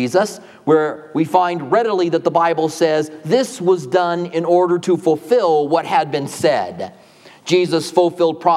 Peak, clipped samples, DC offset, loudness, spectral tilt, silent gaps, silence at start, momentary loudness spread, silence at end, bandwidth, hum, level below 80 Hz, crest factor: 0 dBFS; under 0.1%; under 0.1%; -17 LUFS; -5.5 dB/octave; none; 0 s; 6 LU; 0 s; 14 kHz; none; -70 dBFS; 16 dB